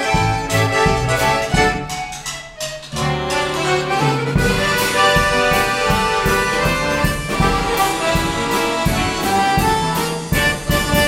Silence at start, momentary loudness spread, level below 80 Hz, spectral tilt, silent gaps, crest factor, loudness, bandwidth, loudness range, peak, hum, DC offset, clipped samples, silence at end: 0 s; 7 LU; -30 dBFS; -4 dB/octave; none; 16 dB; -17 LUFS; 16.5 kHz; 3 LU; -2 dBFS; none; under 0.1%; under 0.1%; 0 s